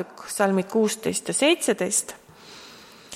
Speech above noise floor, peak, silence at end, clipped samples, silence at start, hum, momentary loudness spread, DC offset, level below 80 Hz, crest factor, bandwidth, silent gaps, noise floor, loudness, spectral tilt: 23 dB; -8 dBFS; 0 s; under 0.1%; 0 s; none; 22 LU; under 0.1%; -68 dBFS; 18 dB; 16.5 kHz; none; -47 dBFS; -23 LUFS; -3 dB/octave